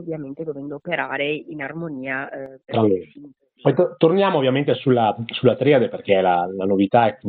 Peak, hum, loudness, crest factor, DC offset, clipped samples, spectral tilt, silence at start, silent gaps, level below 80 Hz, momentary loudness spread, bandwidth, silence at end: -2 dBFS; none; -20 LUFS; 18 dB; under 0.1%; under 0.1%; -5 dB/octave; 0 s; none; -66 dBFS; 13 LU; 4.6 kHz; 0 s